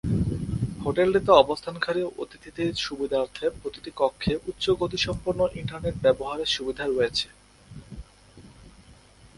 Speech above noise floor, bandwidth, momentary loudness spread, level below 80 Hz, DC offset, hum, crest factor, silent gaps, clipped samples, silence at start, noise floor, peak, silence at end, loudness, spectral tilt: 27 dB; 11.5 kHz; 15 LU; -46 dBFS; under 0.1%; none; 24 dB; none; under 0.1%; 0.05 s; -52 dBFS; -2 dBFS; 0.65 s; -26 LUFS; -5.5 dB/octave